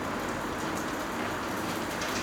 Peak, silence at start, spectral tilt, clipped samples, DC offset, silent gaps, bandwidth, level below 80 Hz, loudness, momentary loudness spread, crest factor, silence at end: -18 dBFS; 0 s; -3.5 dB/octave; under 0.1%; under 0.1%; none; over 20 kHz; -52 dBFS; -32 LUFS; 1 LU; 14 dB; 0 s